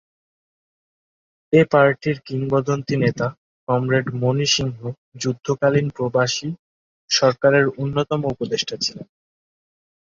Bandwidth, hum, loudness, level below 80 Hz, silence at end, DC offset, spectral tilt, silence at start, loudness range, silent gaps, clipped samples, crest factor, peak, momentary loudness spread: 7.6 kHz; none; -20 LUFS; -56 dBFS; 1.15 s; under 0.1%; -5 dB/octave; 1.5 s; 2 LU; 3.37-3.67 s, 4.98-5.12 s, 6.59-7.08 s; under 0.1%; 20 dB; -2 dBFS; 11 LU